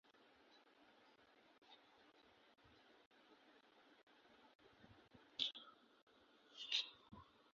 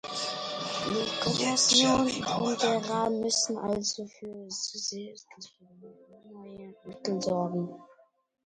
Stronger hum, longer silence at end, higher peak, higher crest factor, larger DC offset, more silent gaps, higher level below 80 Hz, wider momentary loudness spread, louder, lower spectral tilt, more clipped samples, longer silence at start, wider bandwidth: neither; second, 0.15 s vs 0.6 s; second, -22 dBFS vs -10 dBFS; first, 34 dB vs 20 dB; neither; first, 1.58-1.62 s, 3.06-3.11 s, 4.03-4.07 s, 4.55-4.59 s, 6.02-6.07 s vs none; second, -88 dBFS vs -62 dBFS; first, 27 LU vs 24 LU; second, -46 LUFS vs -28 LUFS; second, 1.5 dB/octave vs -3 dB/octave; neither; about the same, 0.05 s vs 0.05 s; second, 7 kHz vs 11 kHz